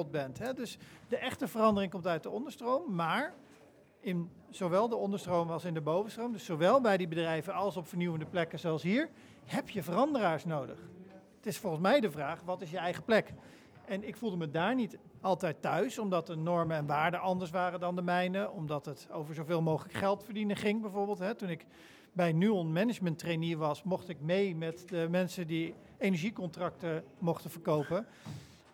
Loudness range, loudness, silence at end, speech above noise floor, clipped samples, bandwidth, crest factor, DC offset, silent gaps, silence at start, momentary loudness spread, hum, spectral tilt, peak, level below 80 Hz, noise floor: 3 LU; -34 LUFS; 0.2 s; 27 dB; under 0.1%; 19 kHz; 20 dB; under 0.1%; none; 0 s; 11 LU; none; -6.5 dB/octave; -14 dBFS; -72 dBFS; -61 dBFS